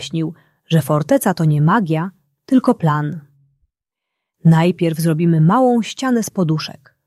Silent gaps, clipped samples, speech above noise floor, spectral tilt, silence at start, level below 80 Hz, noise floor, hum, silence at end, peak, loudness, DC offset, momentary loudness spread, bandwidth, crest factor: none; under 0.1%; 66 dB; -7 dB/octave; 0 s; -58 dBFS; -81 dBFS; none; 0.35 s; -2 dBFS; -16 LUFS; under 0.1%; 10 LU; 13.5 kHz; 14 dB